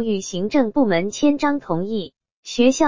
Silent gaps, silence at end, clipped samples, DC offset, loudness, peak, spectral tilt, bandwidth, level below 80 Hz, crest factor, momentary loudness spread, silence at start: 2.32-2.43 s; 0 s; under 0.1%; under 0.1%; -20 LUFS; -4 dBFS; -5 dB/octave; 7.6 kHz; -54 dBFS; 14 dB; 11 LU; 0 s